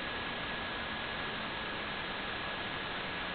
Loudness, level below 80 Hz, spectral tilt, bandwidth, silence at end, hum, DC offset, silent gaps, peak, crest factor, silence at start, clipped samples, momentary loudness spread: -37 LUFS; -56 dBFS; -1 dB/octave; 4.9 kHz; 0 s; none; under 0.1%; none; -26 dBFS; 14 dB; 0 s; under 0.1%; 0 LU